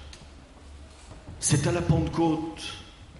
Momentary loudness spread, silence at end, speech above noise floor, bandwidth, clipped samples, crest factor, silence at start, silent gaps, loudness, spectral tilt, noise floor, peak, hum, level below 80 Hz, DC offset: 23 LU; 0 s; 23 dB; 11.5 kHz; under 0.1%; 20 dB; 0 s; none; -26 LUFS; -5 dB/octave; -48 dBFS; -10 dBFS; none; -44 dBFS; under 0.1%